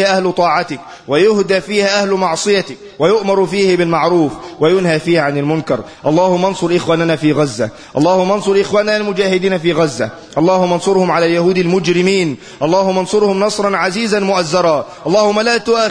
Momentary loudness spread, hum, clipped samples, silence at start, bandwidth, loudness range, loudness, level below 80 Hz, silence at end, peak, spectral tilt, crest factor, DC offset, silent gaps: 5 LU; none; under 0.1%; 0 s; 10.5 kHz; 1 LU; -14 LUFS; -52 dBFS; 0 s; 0 dBFS; -5 dB/octave; 12 dB; under 0.1%; none